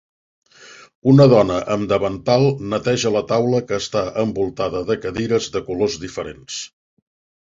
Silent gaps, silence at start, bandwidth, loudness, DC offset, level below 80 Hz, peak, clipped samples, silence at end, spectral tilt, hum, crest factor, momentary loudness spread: 0.95-1.02 s; 0.65 s; 7.8 kHz; -18 LUFS; under 0.1%; -48 dBFS; -2 dBFS; under 0.1%; 0.8 s; -6 dB/octave; none; 18 dB; 16 LU